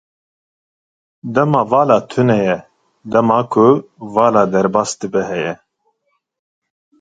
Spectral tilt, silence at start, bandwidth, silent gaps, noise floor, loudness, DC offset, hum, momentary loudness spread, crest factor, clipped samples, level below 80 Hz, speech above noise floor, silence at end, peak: -6.5 dB/octave; 1.25 s; 9.4 kHz; none; -68 dBFS; -15 LUFS; under 0.1%; none; 9 LU; 16 dB; under 0.1%; -56 dBFS; 54 dB; 1.45 s; 0 dBFS